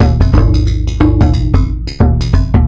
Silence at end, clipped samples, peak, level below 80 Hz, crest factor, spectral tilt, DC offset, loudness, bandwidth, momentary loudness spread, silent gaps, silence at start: 0 s; under 0.1%; 0 dBFS; -14 dBFS; 8 dB; -8 dB/octave; under 0.1%; -12 LUFS; 7.4 kHz; 4 LU; none; 0 s